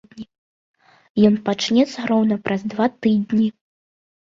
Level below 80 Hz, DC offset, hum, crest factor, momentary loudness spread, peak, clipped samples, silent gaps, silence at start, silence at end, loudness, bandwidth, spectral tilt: -62 dBFS; under 0.1%; none; 16 dB; 8 LU; -4 dBFS; under 0.1%; 0.38-0.74 s, 1.10-1.15 s; 0.15 s; 0.75 s; -19 LUFS; 7.6 kHz; -6 dB/octave